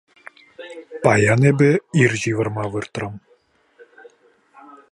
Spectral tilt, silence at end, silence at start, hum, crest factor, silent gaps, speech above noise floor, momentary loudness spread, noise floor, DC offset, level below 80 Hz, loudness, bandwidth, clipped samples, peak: -6.5 dB/octave; 1.75 s; 0.6 s; none; 20 dB; none; 41 dB; 22 LU; -59 dBFS; under 0.1%; -54 dBFS; -18 LUFS; 11.5 kHz; under 0.1%; 0 dBFS